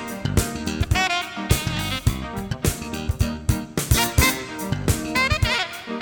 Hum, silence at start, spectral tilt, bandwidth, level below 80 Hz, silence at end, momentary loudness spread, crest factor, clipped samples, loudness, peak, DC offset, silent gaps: none; 0 s; -4 dB/octave; 19 kHz; -30 dBFS; 0 s; 9 LU; 20 dB; under 0.1%; -23 LUFS; -4 dBFS; under 0.1%; none